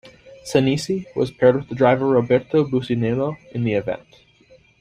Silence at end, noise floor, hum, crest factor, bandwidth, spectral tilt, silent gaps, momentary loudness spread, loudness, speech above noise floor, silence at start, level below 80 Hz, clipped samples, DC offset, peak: 0.85 s; -53 dBFS; none; 18 dB; 12.5 kHz; -7 dB/octave; none; 8 LU; -20 LUFS; 33 dB; 0.05 s; -54 dBFS; under 0.1%; under 0.1%; -2 dBFS